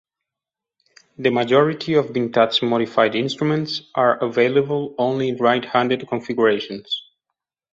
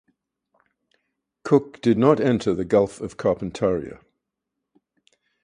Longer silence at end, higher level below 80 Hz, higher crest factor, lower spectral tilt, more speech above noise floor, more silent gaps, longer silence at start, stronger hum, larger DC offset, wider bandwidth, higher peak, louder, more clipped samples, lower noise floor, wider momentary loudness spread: second, 0.7 s vs 1.5 s; second, -64 dBFS vs -54 dBFS; about the same, 18 dB vs 22 dB; second, -6 dB/octave vs -7.5 dB/octave; first, 68 dB vs 61 dB; neither; second, 1.2 s vs 1.45 s; neither; neither; second, 7.8 kHz vs 10.5 kHz; about the same, -2 dBFS vs -2 dBFS; about the same, -20 LUFS vs -22 LUFS; neither; first, -87 dBFS vs -82 dBFS; about the same, 7 LU vs 9 LU